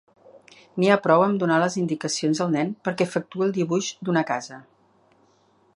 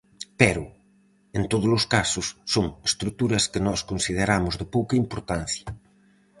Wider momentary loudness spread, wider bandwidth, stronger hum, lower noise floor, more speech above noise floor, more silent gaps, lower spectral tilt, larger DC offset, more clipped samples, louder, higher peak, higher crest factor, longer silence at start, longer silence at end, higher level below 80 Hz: second, 8 LU vs 11 LU; about the same, 11 kHz vs 11.5 kHz; neither; about the same, -61 dBFS vs -60 dBFS; about the same, 39 dB vs 36 dB; neither; about the same, -5 dB/octave vs -4 dB/octave; neither; neither; about the same, -23 LUFS vs -24 LUFS; about the same, -2 dBFS vs 0 dBFS; about the same, 22 dB vs 26 dB; first, 0.35 s vs 0.2 s; first, 1.15 s vs 0.6 s; second, -72 dBFS vs -44 dBFS